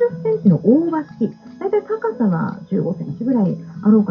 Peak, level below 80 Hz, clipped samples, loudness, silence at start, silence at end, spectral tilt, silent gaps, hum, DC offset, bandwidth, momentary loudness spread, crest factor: -2 dBFS; -60 dBFS; under 0.1%; -19 LUFS; 0 s; 0 s; -11.5 dB/octave; none; none; under 0.1%; 5.4 kHz; 9 LU; 16 dB